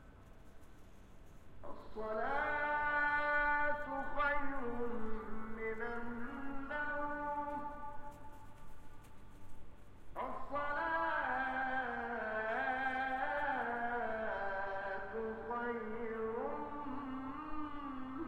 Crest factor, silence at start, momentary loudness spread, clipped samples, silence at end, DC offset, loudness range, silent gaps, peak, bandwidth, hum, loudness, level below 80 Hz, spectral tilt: 16 dB; 0 s; 16 LU; under 0.1%; 0 s; under 0.1%; 8 LU; none; -24 dBFS; 8.2 kHz; none; -39 LUFS; -54 dBFS; -6 dB/octave